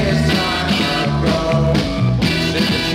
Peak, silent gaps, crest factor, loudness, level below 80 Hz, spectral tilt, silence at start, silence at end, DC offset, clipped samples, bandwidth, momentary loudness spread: -4 dBFS; none; 12 dB; -16 LUFS; -30 dBFS; -5.5 dB/octave; 0 s; 0 s; under 0.1%; under 0.1%; 16 kHz; 1 LU